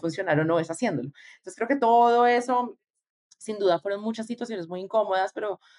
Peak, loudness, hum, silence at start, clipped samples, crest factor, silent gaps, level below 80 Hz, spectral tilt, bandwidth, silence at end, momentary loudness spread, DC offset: -10 dBFS; -25 LUFS; none; 0.05 s; under 0.1%; 16 dB; 2.90-2.94 s, 3.10-3.30 s; -78 dBFS; -5.5 dB/octave; 11.5 kHz; 0.25 s; 16 LU; under 0.1%